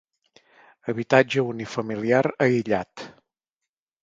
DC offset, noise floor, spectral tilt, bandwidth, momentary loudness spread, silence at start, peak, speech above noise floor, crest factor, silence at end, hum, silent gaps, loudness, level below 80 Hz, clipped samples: under 0.1%; -87 dBFS; -6.5 dB/octave; 7.8 kHz; 18 LU; 0.85 s; 0 dBFS; 64 dB; 24 dB; 0.95 s; none; none; -23 LUFS; -64 dBFS; under 0.1%